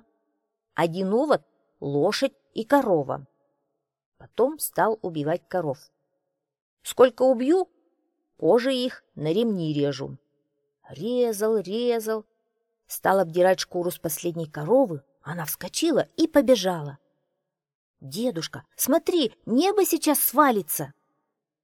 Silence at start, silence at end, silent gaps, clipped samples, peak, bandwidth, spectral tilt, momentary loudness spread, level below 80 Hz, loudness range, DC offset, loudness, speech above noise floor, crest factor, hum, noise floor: 0.75 s; 0.75 s; 4.06-4.12 s, 6.62-6.77 s, 17.75-17.94 s; under 0.1%; -4 dBFS; 19 kHz; -4.5 dB/octave; 14 LU; -66 dBFS; 4 LU; under 0.1%; -24 LUFS; 58 dB; 20 dB; none; -82 dBFS